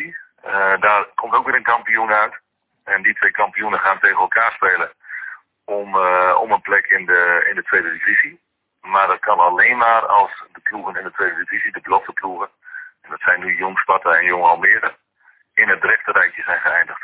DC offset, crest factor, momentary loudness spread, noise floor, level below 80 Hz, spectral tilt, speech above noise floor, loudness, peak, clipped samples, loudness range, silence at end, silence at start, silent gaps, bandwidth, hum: under 0.1%; 16 dB; 13 LU; -56 dBFS; -62 dBFS; -6 dB/octave; 39 dB; -16 LUFS; -2 dBFS; under 0.1%; 4 LU; 0.05 s; 0 s; none; 4 kHz; none